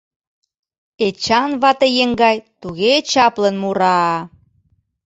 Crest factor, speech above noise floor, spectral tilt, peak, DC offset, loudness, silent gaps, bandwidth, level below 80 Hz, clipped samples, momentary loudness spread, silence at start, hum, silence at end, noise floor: 16 dB; 45 dB; -4 dB/octave; -2 dBFS; under 0.1%; -16 LUFS; none; 8.2 kHz; -54 dBFS; under 0.1%; 9 LU; 1 s; none; 0.8 s; -61 dBFS